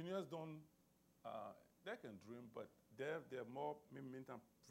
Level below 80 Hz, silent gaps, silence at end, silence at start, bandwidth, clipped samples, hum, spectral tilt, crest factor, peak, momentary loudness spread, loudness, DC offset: -88 dBFS; none; 0 s; 0 s; 16 kHz; under 0.1%; none; -6 dB/octave; 20 dB; -34 dBFS; 10 LU; -53 LUFS; under 0.1%